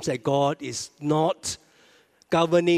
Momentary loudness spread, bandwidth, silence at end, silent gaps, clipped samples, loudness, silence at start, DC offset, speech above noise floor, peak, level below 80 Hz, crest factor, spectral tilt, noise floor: 11 LU; 14.5 kHz; 0 s; none; under 0.1%; -25 LUFS; 0 s; under 0.1%; 35 dB; -8 dBFS; -64 dBFS; 18 dB; -5 dB/octave; -58 dBFS